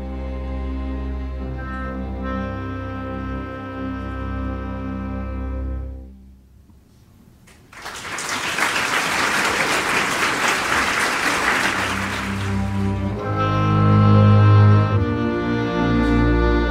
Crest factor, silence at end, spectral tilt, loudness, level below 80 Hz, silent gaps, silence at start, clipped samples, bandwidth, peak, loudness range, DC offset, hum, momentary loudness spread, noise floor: 18 dB; 0 s; -5 dB/octave; -20 LUFS; -30 dBFS; none; 0 s; under 0.1%; 15.5 kHz; -2 dBFS; 14 LU; under 0.1%; none; 15 LU; -49 dBFS